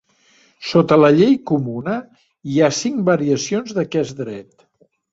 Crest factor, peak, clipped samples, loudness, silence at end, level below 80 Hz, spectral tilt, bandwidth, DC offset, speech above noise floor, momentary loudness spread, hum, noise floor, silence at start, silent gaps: 16 dB; -2 dBFS; under 0.1%; -17 LUFS; 0.7 s; -58 dBFS; -6 dB/octave; 8 kHz; under 0.1%; 39 dB; 17 LU; none; -55 dBFS; 0.6 s; none